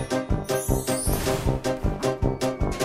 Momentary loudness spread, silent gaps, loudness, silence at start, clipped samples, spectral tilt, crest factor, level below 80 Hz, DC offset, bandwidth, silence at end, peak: 2 LU; none; -26 LUFS; 0 s; under 0.1%; -5 dB/octave; 16 dB; -32 dBFS; under 0.1%; 16 kHz; 0 s; -10 dBFS